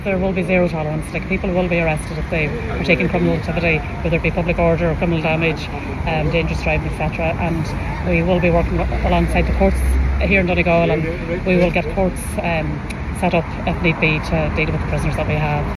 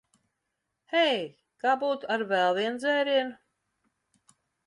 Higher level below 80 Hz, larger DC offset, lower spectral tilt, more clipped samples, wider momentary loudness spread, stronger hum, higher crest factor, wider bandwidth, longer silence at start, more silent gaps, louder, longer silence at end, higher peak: first, -26 dBFS vs -80 dBFS; neither; first, -7 dB/octave vs -4 dB/octave; neither; about the same, 7 LU vs 7 LU; neither; about the same, 18 dB vs 18 dB; first, 13.5 kHz vs 11 kHz; second, 0 s vs 0.9 s; neither; first, -18 LUFS vs -27 LUFS; second, 0.05 s vs 1.35 s; first, 0 dBFS vs -12 dBFS